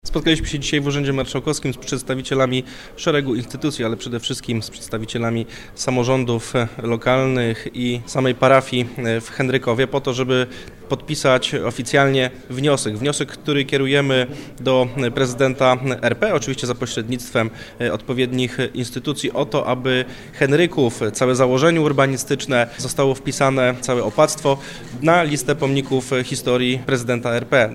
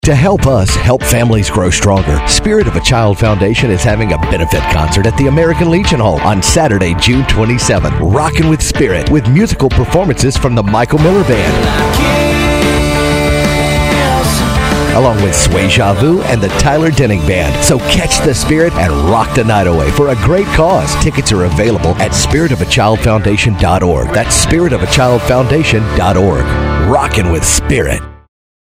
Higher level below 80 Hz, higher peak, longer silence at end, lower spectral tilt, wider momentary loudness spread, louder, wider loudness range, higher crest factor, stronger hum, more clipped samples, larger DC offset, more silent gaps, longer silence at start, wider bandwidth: second, -42 dBFS vs -20 dBFS; about the same, 0 dBFS vs 0 dBFS; second, 0 s vs 0.55 s; about the same, -5 dB/octave vs -5 dB/octave; first, 8 LU vs 2 LU; second, -19 LUFS vs -10 LUFS; first, 4 LU vs 1 LU; first, 20 dB vs 10 dB; neither; neither; neither; neither; about the same, 0.05 s vs 0.05 s; about the same, 16 kHz vs 16 kHz